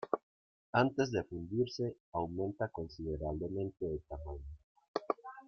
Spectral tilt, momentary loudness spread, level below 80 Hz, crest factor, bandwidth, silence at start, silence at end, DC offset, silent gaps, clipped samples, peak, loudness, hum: -7 dB/octave; 12 LU; -56 dBFS; 24 dB; 6.8 kHz; 0 s; 0 s; under 0.1%; 0.23-0.73 s, 2.00-2.12 s, 4.64-4.75 s, 4.88-4.94 s; under 0.1%; -14 dBFS; -38 LUFS; none